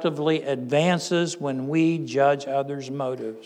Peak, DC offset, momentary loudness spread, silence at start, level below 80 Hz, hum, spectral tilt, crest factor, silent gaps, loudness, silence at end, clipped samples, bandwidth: -8 dBFS; under 0.1%; 8 LU; 0 s; -86 dBFS; none; -5.5 dB/octave; 16 dB; none; -24 LUFS; 0 s; under 0.1%; 11 kHz